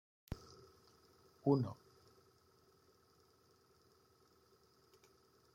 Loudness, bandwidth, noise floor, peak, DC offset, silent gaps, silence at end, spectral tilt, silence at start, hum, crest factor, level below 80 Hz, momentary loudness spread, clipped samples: -40 LUFS; 16 kHz; -72 dBFS; -20 dBFS; under 0.1%; none; 3.8 s; -9 dB/octave; 0.3 s; none; 26 dB; -70 dBFS; 25 LU; under 0.1%